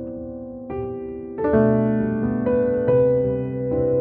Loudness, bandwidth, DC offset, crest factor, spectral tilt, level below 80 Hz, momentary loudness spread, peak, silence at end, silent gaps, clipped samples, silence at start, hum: -21 LUFS; 3.5 kHz; under 0.1%; 16 dB; -13.5 dB/octave; -44 dBFS; 14 LU; -6 dBFS; 0 s; none; under 0.1%; 0 s; none